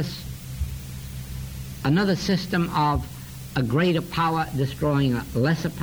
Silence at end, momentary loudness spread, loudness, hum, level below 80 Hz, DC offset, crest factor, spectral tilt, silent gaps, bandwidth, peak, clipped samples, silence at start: 0 s; 14 LU; -24 LUFS; none; -40 dBFS; under 0.1%; 14 dB; -6.5 dB/octave; none; over 20 kHz; -10 dBFS; under 0.1%; 0 s